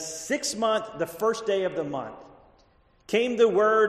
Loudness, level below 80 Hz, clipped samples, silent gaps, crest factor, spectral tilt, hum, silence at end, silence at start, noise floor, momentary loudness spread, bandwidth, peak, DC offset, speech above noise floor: -26 LUFS; -64 dBFS; under 0.1%; none; 18 dB; -3.5 dB/octave; none; 0 s; 0 s; -61 dBFS; 12 LU; 13.5 kHz; -8 dBFS; under 0.1%; 37 dB